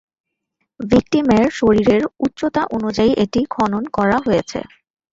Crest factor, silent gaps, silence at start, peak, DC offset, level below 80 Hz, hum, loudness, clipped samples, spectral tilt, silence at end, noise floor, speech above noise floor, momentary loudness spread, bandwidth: 16 dB; none; 0.8 s; -2 dBFS; under 0.1%; -42 dBFS; none; -17 LUFS; under 0.1%; -6.5 dB/octave; 0.45 s; -73 dBFS; 57 dB; 7 LU; 7.8 kHz